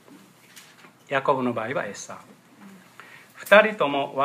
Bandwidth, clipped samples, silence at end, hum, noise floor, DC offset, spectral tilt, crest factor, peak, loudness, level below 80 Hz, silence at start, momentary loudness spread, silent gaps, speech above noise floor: 15.5 kHz; under 0.1%; 0 s; none; -51 dBFS; under 0.1%; -4.5 dB/octave; 26 dB; 0 dBFS; -22 LUFS; -78 dBFS; 0.55 s; 23 LU; none; 29 dB